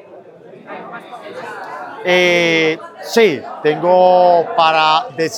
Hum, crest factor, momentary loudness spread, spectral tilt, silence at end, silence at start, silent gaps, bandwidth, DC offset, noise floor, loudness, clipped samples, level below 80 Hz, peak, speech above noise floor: none; 14 dB; 20 LU; -4 dB/octave; 0 s; 0.1 s; none; 17 kHz; under 0.1%; -39 dBFS; -13 LUFS; under 0.1%; -72 dBFS; 0 dBFS; 25 dB